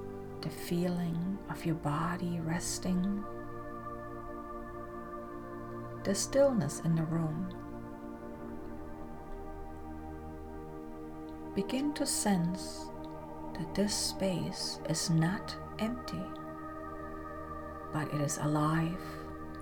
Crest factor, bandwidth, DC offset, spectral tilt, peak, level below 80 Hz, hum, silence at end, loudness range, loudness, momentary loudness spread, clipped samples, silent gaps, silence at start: 18 dB; over 20 kHz; under 0.1%; -5 dB/octave; -18 dBFS; -52 dBFS; none; 0 s; 8 LU; -36 LUFS; 15 LU; under 0.1%; none; 0 s